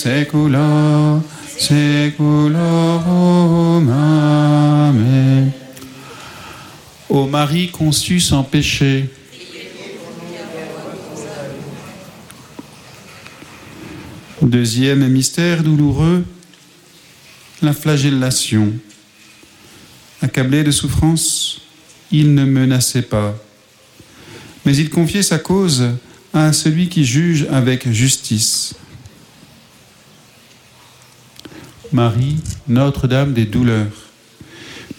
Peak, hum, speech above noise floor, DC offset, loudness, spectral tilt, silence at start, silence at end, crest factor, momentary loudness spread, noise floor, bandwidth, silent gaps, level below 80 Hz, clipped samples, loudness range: -2 dBFS; none; 34 dB; under 0.1%; -14 LUFS; -5.5 dB/octave; 0 s; 0.05 s; 14 dB; 21 LU; -47 dBFS; 16.5 kHz; none; -42 dBFS; under 0.1%; 11 LU